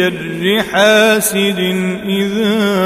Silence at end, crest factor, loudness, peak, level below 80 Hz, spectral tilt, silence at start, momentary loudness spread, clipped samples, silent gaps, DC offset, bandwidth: 0 s; 14 dB; -13 LUFS; 0 dBFS; -50 dBFS; -4 dB/octave; 0 s; 8 LU; under 0.1%; none; under 0.1%; 16 kHz